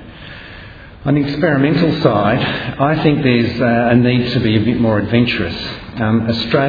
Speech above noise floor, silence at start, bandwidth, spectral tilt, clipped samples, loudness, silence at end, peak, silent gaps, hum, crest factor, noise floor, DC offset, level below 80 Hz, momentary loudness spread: 21 dB; 0 s; 5 kHz; -8.5 dB/octave; under 0.1%; -15 LUFS; 0 s; 0 dBFS; none; none; 14 dB; -35 dBFS; under 0.1%; -40 dBFS; 13 LU